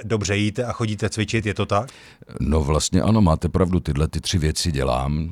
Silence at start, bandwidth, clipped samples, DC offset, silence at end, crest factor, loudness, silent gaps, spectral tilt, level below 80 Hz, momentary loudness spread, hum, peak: 0 s; 14.5 kHz; under 0.1%; under 0.1%; 0 s; 16 dB; -21 LUFS; none; -5.5 dB/octave; -32 dBFS; 6 LU; none; -6 dBFS